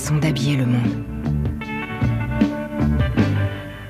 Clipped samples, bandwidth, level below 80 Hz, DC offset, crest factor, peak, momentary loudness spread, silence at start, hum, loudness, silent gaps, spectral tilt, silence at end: under 0.1%; 15 kHz; -32 dBFS; under 0.1%; 16 dB; -4 dBFS; 7 LU; 0 s; none; -21 LUFS; none; -6.5 dB/octave; 0 s